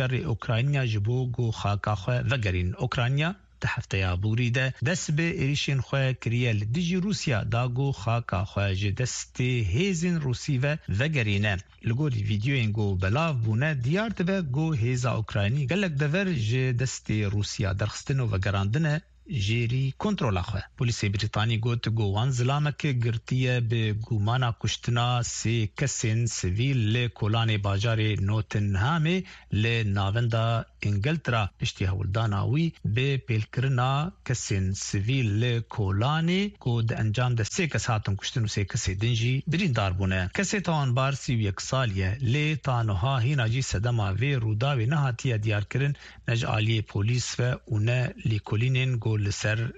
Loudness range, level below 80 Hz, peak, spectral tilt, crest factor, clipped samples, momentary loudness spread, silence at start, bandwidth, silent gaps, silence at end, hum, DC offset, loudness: 1 LU; -48 dBFS; -12 dBFS; -5.5 dB/octave; 14 dB; under 0.1%; 3 LU; 0 s; 8.2 kHz; none; 0 s; none; under 0.1%; -27 LUFS